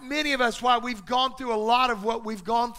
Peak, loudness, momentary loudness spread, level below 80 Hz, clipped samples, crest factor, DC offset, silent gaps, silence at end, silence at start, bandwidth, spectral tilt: -8 dBFS; -25 LUFS; 6 LU; -52 dBFS; under 0.1%; 18 dB; under 0.1%; none; 0 s; 0 s; 16 kHz; -3 dB/octave